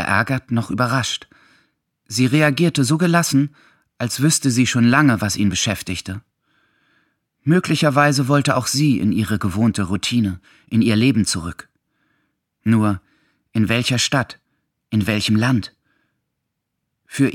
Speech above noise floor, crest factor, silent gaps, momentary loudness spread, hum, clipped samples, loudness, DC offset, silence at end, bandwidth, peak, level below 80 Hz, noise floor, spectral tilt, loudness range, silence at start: 59 dB; 18 dB; none; 11 LU; none; under 0.1%; -18 LUFS; under 0.1%; 0 s; 16.5 kHz; -2 dBFS; -52 dBFS; -77 dBFS; -5 dB/octave; 4 LU; 0 s